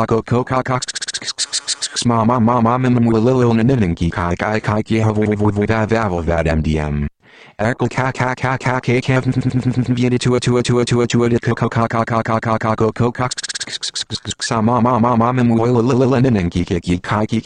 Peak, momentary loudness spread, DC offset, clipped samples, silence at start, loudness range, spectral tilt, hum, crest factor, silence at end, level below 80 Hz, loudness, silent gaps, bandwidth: -2 dBFS; 7 LU; under 0.1%; under 0.1%; 0 s; 3 LU; -5.5 dB/octave; none; 14 dB; 0.05 s; -36 dBFS; -17 LUFS; none; 10.5 kHz